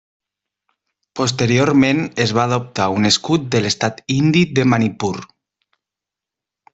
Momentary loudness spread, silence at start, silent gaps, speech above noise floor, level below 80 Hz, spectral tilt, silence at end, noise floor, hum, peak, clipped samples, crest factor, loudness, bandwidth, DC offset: 7 LU; 1.15 s; none; 70 dB; -52 dBFS; -5 dB/octave; 1.5 s; -86 dBFS; none; -2 dBFS; under 0.1%; 16 dB; -17 LUFS; 8.2 kHz; under 0.1%